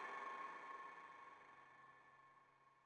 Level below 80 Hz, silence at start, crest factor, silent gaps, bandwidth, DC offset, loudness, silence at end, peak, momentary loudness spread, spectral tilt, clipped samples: under -90 dBFS; 0 s; 18 dB; none; 10 kHz; under 0.1%; -56 LUFS; 0 s; -38 dBFS; 17 LU; -3 dB/octave; under 0.1%